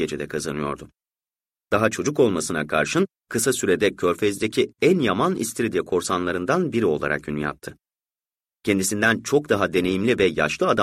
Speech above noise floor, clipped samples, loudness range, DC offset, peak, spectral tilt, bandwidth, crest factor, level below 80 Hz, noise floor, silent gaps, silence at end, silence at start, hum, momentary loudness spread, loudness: over 68 dB; under 0.1%; 3 LU; under 0.1%; -4 dBFS; -4.5 dB/octave; 16 kHz; 18 dB; -54 dBFS; under -90 dBFS; none; 0 s; 0 s; none; 8 LU; -22 LUFS